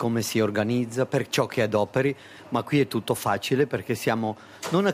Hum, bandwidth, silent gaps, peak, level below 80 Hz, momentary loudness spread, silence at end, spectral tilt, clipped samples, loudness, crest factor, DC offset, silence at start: none; 16 kHz; none; -10 dBFS; -64 dBFS; 5 LU; 0 s; -5.5 dB/octave; under 0.1%; -25 LUFS; 16 dB; under 0.1%; 0 s